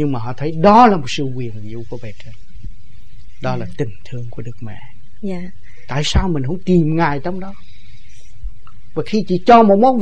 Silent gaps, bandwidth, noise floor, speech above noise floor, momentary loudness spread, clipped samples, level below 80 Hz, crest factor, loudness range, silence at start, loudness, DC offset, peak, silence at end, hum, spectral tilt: none; 9 kHz; -43 dBFS; 27 dB; 24 LU; under 0.1%; -32 dBFS; 18 dB; 12 LU; 0 s; -16 LUFS; 9%; 0 dBFS; 0 s; none; -6.5 dB/octave